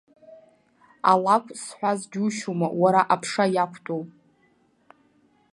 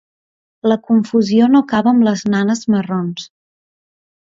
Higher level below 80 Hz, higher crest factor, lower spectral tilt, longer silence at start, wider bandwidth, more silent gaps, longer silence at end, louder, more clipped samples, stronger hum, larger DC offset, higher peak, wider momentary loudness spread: second, -76 dBFS vs -58 dBFS; first, 22 dB vs 14 dB; second, -5 dB/octave vs -6.5 dB/octave; second, 0.3 s vs 0.65 s; first, 11.5 kHz vs 7.6 kHz; neither; first, 1.45 s vs 1 s; second, -23 LUFS vs -15 LUFS; neither; neither; neither; about the same, -4 dBFS vs -2 dBFS; first, 13 LU vs 9 LU